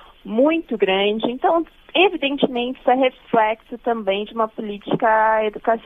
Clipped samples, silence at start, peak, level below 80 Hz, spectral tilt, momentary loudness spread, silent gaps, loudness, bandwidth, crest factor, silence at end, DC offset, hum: under 0.1%; 0.25 s; -2 dBFS; -54 dBFS; -7.5 dB/octave; 8 LU; none; -20 LUFS; 3.9 kHz; 18 dB; 0.05 s; under 0.1%; none